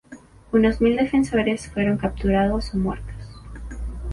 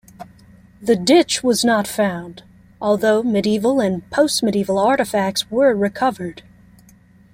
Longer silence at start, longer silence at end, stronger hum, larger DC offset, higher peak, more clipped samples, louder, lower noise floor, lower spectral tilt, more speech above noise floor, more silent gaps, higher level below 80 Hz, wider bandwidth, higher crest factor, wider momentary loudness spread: about the same, 0.1 s vs 0.2 s; second, 0 s vs 0.95 s; second, none vs 60 Hz at -45 dBFS; neither; second, -6 dBFS vs -2 dBFS; neither; second, -21 LUFS vs -18 LUFS; second, -45 dBFS vs -49 dBFS; first, -7 dB/octave vs -4.5 dB/octave; second, 25 dB vs 32 dB; neither; first, -34 dBFS vs -54 dBFS; second, 11.5 kHz vs 16.5 kHz; about the same, 16 dB vs 16 dB; first, 19 LU vs 9 LU